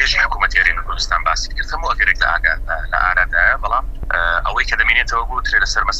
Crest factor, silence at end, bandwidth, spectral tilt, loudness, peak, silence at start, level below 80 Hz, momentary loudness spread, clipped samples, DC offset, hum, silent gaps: 16 dB; 0 s; 8.2 kHz; -1.5 dB/octave; -16 LUFS; 0 dBFS; 0 s; -24 dBFS; 7 LU; under 0.1%; under 0.1%; none; none